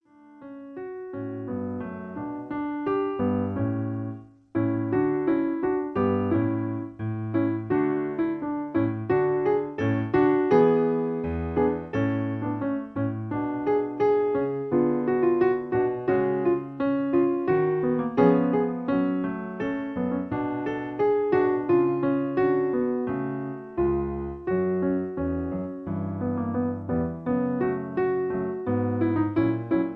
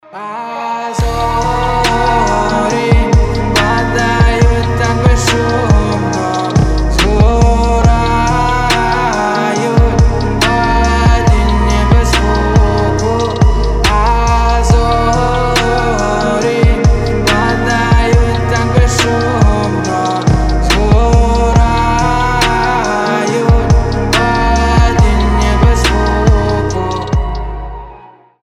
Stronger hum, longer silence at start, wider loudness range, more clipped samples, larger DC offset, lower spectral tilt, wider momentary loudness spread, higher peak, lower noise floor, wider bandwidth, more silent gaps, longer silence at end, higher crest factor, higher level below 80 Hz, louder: neither; first, 0.3 s vs 0.1 s; first, 5 LU vs 1 LU; neither; neither; first, -10.5 dB/octave vs -5.5 dB/octave; first, 9 LU vs 4 LU; second, -6 dBFS vs 0 dBFS; first, -47 dBFS vs -38 dBFS; second, 5 kHz vs 14 kHz; neither; second, 0 s vs 0.35 s; first, 18 dB vs 10 dB; second, -50 dBFS vs -14 dBFS; second, -26 LUFS vs -12 LUFS